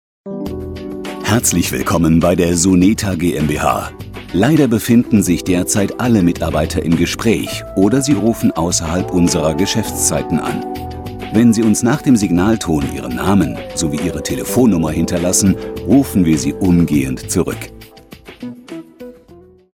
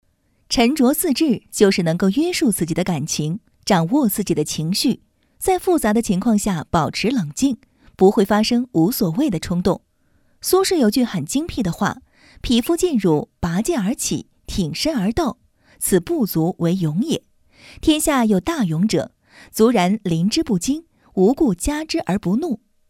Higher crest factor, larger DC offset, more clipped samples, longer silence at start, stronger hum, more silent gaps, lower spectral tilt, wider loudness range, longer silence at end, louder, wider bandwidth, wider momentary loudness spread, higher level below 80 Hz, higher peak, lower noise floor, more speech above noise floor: second, 14 dB vs 20 dB; neither; neither; second, 0.25 s vs 0.5 s; neither; neither; about the same, -5 dB/octave vs -5 dB/octave; about the same, 2 LU vs 3 LU; about the same, 0.4 s vs 0.35 s; first, -15 LUFS vs -19 LUFS; about the same, 18 kHz vs 17 kHz; first, 14 LU vs 8 LU; first, -34 dBFS vs -42 dBFS; about the same, 0 dBFS vs 0 dBFS; second, -43 dBFS vs -60 dBFS; second, 29 dB vs 41 dB